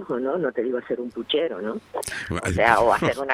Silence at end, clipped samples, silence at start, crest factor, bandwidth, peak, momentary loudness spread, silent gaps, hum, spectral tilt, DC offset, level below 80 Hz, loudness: 0 s; under 0.1%; 0 s; 24 dB; 16 kHz; 0 dBFS; 12 LU; none; none; -4.5 dB/octave; under 0.1%; -50 dBFS; -23 LUFS